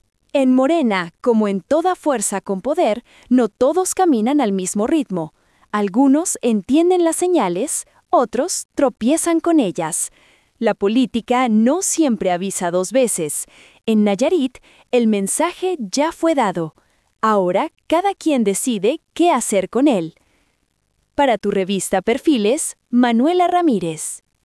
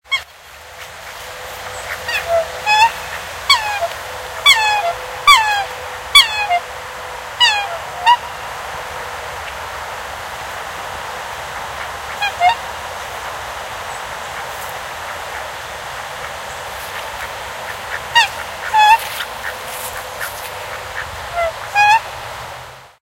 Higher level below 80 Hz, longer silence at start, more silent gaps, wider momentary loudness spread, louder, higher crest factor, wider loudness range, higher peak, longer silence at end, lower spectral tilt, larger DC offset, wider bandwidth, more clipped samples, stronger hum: second, -58 dBFS vs -46 dBFS; first, 0.35 s vs 0.05 s; first, 8.65-8.69 s vs none; second, 7 LU vs 17 LU; about the same, -18 LUFS vs -17 LUFS; second, 14 dB vs 20 dB; second, 2 LU vs 13 LU; second, -4 dBFS vs 0 dBFS; about the same, 0.25 s vs 0.15 s; first, -4.5 dB/octave vs 0 dB/octave; neither; second, 12 kHz vs 16 kHz; neither; neither